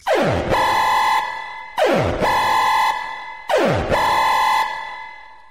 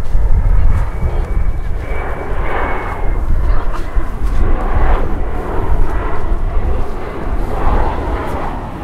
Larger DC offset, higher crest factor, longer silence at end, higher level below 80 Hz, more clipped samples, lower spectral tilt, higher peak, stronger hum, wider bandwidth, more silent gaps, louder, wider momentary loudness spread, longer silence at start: first, 0.5% vs under 0.1%; about the same, 14 dB vs 12 dB; first, 0.15 s vs 0 s; second, -40 dBFS vs -14 dBFS; neither; second, -4 dB/octave vs -8 dB/octave; second, -4 dBFS vs 0 dBFS; neither; first, 16 kHz vs 4.4 kHz; neither; about the same, -18 LUFS vs -20 LUFS; first, 13 LU vs 6 LU; about the same, 0.05 s vs 0 s